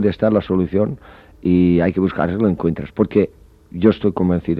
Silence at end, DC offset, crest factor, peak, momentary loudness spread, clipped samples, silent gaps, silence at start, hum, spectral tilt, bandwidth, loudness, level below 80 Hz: 0 s; under 0.1%; 16 dB; -2 dBFS; 8 LU; under 0.1%; none; 0 s; none; -10.5 dB/octave; 5 kHz; -18 LUFS; -42 dBFS